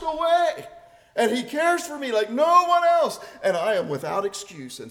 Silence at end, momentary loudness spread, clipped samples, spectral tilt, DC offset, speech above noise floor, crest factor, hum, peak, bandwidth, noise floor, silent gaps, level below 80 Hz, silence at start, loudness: 0 s; 14 LU; under 0.1%; -3.5 dB/octave; under 0.1%; 25 dB; 16 dB; none; -6 dBFS; 17 kHz; -47 dBFS; none; -62 dBFS; 0 s; -22 LUFS